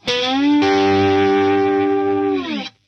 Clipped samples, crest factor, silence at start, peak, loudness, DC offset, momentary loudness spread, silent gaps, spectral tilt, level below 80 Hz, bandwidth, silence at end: under 0.1%; 10 dB; 0.05 s; -6 dBFS; -16 LUFS; under 0.1%; 5 LU; none; -5.5 dB/octave; -56 dBFS; 7.6 kHz; 0.2 s